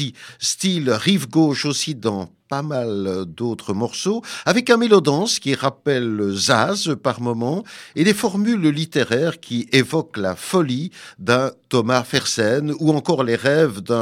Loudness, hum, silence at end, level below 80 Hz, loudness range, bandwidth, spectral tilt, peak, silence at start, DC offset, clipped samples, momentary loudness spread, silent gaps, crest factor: -19 LUFS; none; 0 s; -64 dBFS; 3 LU; 16 kHz; -4.5 dB/octave; 0 dBFS; 0 s; under 0.1%; under 0.1%; 9 LU; none; 20 dB